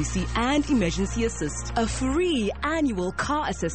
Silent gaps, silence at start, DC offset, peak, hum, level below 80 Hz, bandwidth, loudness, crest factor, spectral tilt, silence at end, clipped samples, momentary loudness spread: none; 0 s; 0.5%; -10 dBFS; none; -36 dBFS; 8.8 kHz; -25 LUFS; 14 dB; -4.5 dB/octave; 0 s; under 0.1%; 4 LU